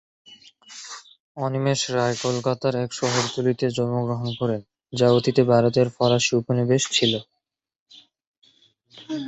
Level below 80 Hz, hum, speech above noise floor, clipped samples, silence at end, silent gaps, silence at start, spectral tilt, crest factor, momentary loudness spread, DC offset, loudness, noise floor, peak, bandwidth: -60 dBFS; none; 59 dB; under 0.1%; 0 s; 1.20-1.35 s, 7.80-7.86 s, 8.27-8.42 s; 0.3 s; -5 dB/octave; 20 dB; 16 LU; under 0.1%; -22 LUFS; -80 dBFS; -4 dBFS; 8.2 kHz